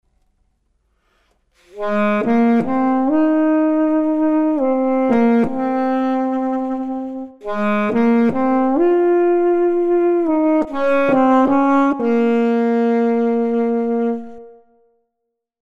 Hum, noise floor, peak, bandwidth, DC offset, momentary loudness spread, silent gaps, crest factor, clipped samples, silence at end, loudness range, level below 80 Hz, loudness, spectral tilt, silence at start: none; -77 dBFS; -2 dBFS; 7 kHz; under 0.1%; 7 LU; none; 14 dB; under 0.1%; 1.1 s; 3 LU; -54 dBFS; -17 LUFS; -8 dB/octave; 1.75 s